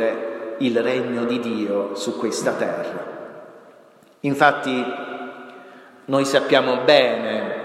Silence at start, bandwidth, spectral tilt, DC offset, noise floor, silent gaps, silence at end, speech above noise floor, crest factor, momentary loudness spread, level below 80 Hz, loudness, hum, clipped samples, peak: 0 s; 14.5 kHz; -4.5 dB/octave; under 0.1%; -50 dBFS; none; 0 s; 30 dB; 22 dB; 19 LU; -74 dBFS; -21 LUFS; none; under 0.1%; 0 dBFS